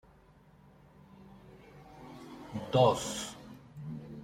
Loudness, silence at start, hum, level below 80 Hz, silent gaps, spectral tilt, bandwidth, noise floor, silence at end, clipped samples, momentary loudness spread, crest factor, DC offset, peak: -32 LUFS; 1.2 s; none; -64 dBFS; none; -5 dB/octave; 16 kHz; -60 dBFS; 0 s; under 0.1%; 28 LU; 24 dB; under 0.1%; -12 dBFS